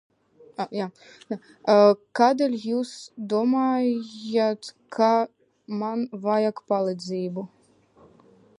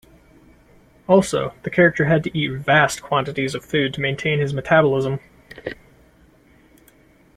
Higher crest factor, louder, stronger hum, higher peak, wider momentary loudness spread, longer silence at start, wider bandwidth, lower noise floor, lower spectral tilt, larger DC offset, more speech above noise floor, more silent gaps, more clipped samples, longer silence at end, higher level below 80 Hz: about the same, 20 dB vs 20 dB; second, -24 LUFS vs -19 LUFS; neither; about the same, -4 dBFS vs -2 dBFS; about the same, 16 LU vs 18 LU; second, 0.6 s vs 1.1 s; second, 11 kHz vs 14 kHz; first, -57 dBFS vs -53 dBFS; about the same, -6 dB/octave vs -5.5 dB/octave; neither; about the same, 33 dB vs 34 dB; neither; neither; second, 1.15 s vs 1.6 s; second, -78 dBFS vs -52 dBFS